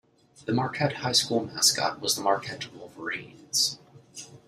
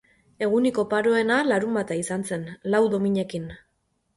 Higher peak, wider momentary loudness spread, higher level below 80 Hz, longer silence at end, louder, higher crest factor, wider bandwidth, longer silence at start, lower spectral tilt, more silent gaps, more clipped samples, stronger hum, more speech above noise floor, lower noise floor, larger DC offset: first, -6 dBFS vs -10 dBFS; first, 19 LU vs 10 LU; second, -66 dBFS vs -60 dBFS; second, 0.1 s vs 0.6 s; about the same, -26 LUFS vs -24 LUFS; first, 22 dB vs 16 dB; first, 15.5 kHz vs 11.5 kHz; about the same, 0.4 s vs 0.4 s; second, -2.5 dB/octave vs -5.5 dB/octave; neither; neither; neither; second, 20 dB vs 49 dB; second, -47 dBFS vs -72 dBFS; neither